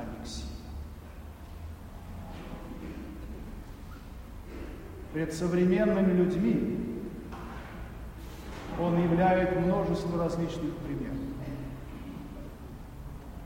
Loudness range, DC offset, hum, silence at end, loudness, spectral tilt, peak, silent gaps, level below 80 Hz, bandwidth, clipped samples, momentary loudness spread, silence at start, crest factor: 14 LU; under 0.1%; none; 0 s; -30 LUFS; -7.5 dB/octave; -14 dBFS; none; -44 dBFS; 16 kHz; under 0.1%; 21 LU; 0 s; 18 dB